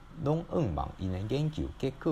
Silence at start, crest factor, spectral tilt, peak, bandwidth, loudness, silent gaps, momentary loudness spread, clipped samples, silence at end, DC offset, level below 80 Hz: 0 s; 16 dB; -8 dB/octave; -16 dBFS; 11.5 kHz; -33 LUFS; none; 5 LU; under 0.1%; 0 s; under 0.1%; -46 dBFS